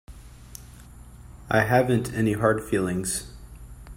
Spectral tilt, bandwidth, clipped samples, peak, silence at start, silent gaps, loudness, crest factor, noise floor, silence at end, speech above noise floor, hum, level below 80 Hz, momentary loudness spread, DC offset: -5.5 dB/octave; 16 kHz; under 0.1%; -8 dBFS; 0.1 s; none; -24 LUFS; 20 dB; -45 dBFS; 0 s; 22 dB; 60 Hz at -45 dBFS; -46 dBFS; 24 LU; under 0.1%